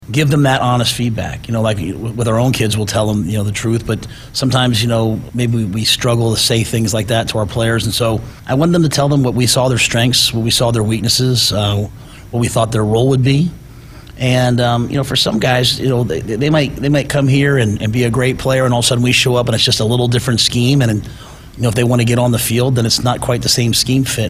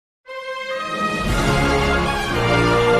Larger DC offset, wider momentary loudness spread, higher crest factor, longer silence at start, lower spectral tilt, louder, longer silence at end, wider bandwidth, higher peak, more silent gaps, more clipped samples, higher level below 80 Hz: neither; second, 6 LU vs 12 LU; about the same, 14 dB vs 14 dB; second, 0 s vs 0.3 s; about the same, -4.5 dB/octave vs -5 dB/octave; first, -14 LUFS vs -19 LUFS; about the same, 0 s vs 0 s; first, 16 kHz vs 14.5 kHz; first, 0 dBFS vs -4 dBFS; neither; neither; second, -36 dBFS vs -30 dBFS